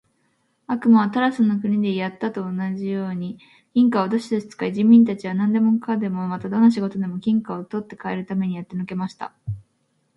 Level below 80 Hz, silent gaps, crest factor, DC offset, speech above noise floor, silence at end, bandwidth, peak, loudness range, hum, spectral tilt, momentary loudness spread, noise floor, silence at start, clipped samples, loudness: -60 dBFS; none; 18 dB; under 0.1%; 47 dB; 0.55 s; 7.4 kHz; -4 dBFS; 4 LU; none; -8 dB/octave; 14 LU; -68 dBFS; 0.7 s; under 0.1%; -21 LUFS